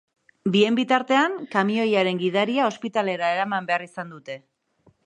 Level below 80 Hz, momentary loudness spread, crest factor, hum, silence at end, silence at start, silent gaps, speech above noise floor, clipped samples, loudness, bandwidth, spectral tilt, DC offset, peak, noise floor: -74 dBFS; 16 LU; 18 dB; none; 0.7 s; 0.45 s; none; 39 dB; under 0.1%; -22 LUFS; 9.8 kHz; -5.5 dB/octave; under 0.1%; -4 dBFS; -62 dBFS